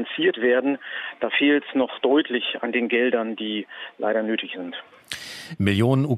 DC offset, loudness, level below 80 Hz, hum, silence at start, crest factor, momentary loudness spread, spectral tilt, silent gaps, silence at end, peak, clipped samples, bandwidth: under 0.1%; -23 LUFS; -68 dBFS; none; 0 s; 18 dB; 14 LU; -6 dB/octave; none; 0 s; -4 dBFS; under 0.1%; 13.5 kHz